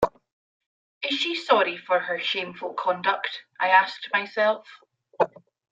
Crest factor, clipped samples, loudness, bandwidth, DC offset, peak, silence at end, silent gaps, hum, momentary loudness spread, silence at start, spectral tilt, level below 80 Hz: 22 dB; under 0.1%; -24 LUFS; 9 kHz; under 0.1%; -4 dBFS; 0.45 s; 0.32-0.60 s, 0.66-1.01 s; none; 9 LU; 0 s; -3.5 dB/octave; -64 dBFS